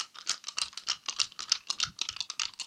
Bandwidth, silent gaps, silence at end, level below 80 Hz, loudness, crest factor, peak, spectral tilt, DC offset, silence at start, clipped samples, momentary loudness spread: 16.5 kHz; none; 0 s; -70 dBFS; -32 LUFS; 30 dB; -6 dBFS; 2.5 dB/octave; under 0.1%; 0 s; under 0.1%; 5 LU